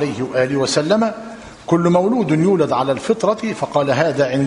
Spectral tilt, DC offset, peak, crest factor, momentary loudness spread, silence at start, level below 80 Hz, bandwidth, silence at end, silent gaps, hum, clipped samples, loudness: -6 dB/octave; under 0.1%; -2 dBFS; 16 dB; 7 LU; 0 s; -54 dBFS; 11 kHz; 0 s; none; none; under 0.1%; -17 LUFS